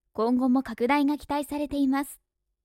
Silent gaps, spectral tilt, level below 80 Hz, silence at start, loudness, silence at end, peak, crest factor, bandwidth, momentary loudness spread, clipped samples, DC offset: none; -5 dB/octave; -56 dBFS; 0.15 s; -26 LUFS; 0.5 s; -10 dBFS; 16 dB; 16 kHz; 7 LU; under 0.1%; under 0.1%